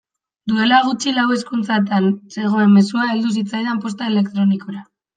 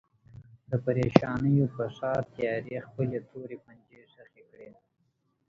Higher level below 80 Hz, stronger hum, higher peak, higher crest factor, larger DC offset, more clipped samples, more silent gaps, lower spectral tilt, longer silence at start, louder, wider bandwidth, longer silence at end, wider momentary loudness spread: second, -66 dBFS vs -58 dBFS; neither; about the same, -2 dBFS vs 0 dBFS; second, 16 dB vs 30 dB; neither; neither; neither; second, -5.5 dB/octave vs -8.5 dB/octave; about the same, 0.45 s vs 0.35 s; first, -17 LUFS vs -29 LUFS; first, 9.2 kHz vs 7.2 kHz; second, 0.35 s vs 0.8 s; second, 9 LU vs 18 LU